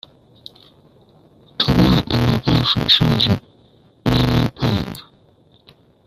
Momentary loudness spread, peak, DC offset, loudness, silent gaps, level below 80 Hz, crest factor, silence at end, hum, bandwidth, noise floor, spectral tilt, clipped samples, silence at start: 11 LU; 0 dBFS; under 0.1%; -17 LUFS; none; -36 dBFS; 20 dB; 1.05 s; none; 15 kHz; -53 dBFS; -6.5 dB/octave; under 0.1%; 1.6 s